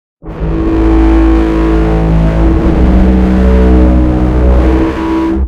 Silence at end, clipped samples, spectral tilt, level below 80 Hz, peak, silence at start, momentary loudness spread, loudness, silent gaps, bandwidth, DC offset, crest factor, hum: 0 s; 2%; -9 dB/octave; -10 dBFS; 0 dBFS; 0.25 s; 5 LU; -9 LUFS; none; 6.2 kHz; under 0.1%; 8 dB; none